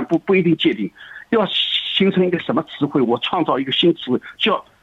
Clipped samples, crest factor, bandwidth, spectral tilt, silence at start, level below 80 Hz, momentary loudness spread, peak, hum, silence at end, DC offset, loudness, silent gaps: under 0.1%; 14 dB; 7.8 kHz; -7 dB/octave; 0 s; -60 dBFS; 6 LU; -4 dBFS; none; 0.2 s; under 0.1%; -18 LUFS; none